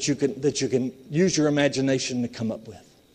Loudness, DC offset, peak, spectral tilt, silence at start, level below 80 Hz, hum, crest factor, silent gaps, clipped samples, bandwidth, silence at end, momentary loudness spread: -24 LUFS; under 0.1%; -8 dBFS; -4.5 dB/octave; 0 s; -60 dBFS; none; 18 dB; none; under 0.1%; 10.5 kHz; 0.35 s; 9 LU